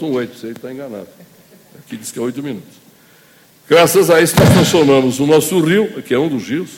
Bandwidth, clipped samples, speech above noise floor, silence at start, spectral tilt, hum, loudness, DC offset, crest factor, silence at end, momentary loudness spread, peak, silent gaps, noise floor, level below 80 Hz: 17 kHz; under 0.1%; 34 dB; 0 s; -5 dB/octave; none; -13 LUFS; under 0.1%; 14 dB; 0 s; 19 LU; 0 dBFS; none; -48 dBFS; -44 dBFS